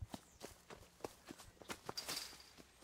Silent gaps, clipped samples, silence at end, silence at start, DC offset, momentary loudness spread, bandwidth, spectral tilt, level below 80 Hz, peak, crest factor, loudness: none; under 0.1%; 0 s; 0 s; under 0.1%; 14 LU; 16.5 kHz; -2.5 dB/octave; -68 dBFS; -28 dBFS; 26 dB; -50 LUFS